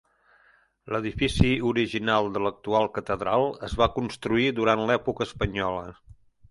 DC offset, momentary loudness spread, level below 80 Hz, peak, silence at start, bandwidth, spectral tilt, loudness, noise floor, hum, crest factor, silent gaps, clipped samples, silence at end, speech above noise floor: under 0.1%; 8 LU; -42 dBFS; -4 dBFS; 0.85 s; 11.5 kHz; -6 dB/octave; -26 LUFS; -62 dBFS; none; 22 dB; none; under 0.1%; 0.6 s; 36 dB